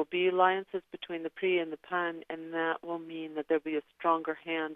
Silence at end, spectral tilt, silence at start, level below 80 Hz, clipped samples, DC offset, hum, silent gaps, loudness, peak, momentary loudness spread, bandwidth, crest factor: 0 s; -7 dB/octave; 0 s; -82 dBFS; under 0.1%; under 0.1%; none; none; -32 LUFS; -12 dBFS; 12 LU; 3.9 kHz; 20 dB